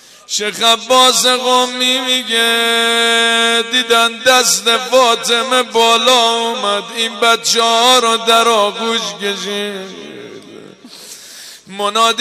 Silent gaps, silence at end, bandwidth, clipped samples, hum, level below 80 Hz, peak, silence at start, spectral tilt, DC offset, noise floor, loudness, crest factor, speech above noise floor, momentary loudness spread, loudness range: none; 0 s; 15.5 kHz; under 0.1%; none; -66 dBFS; -2 dBFS; 0.3 s; -0.5 dB/octave; under 0.1%; -36 dBFS; -12 LUFS; 12 dB; 23 dB; 17 LU; 6 LU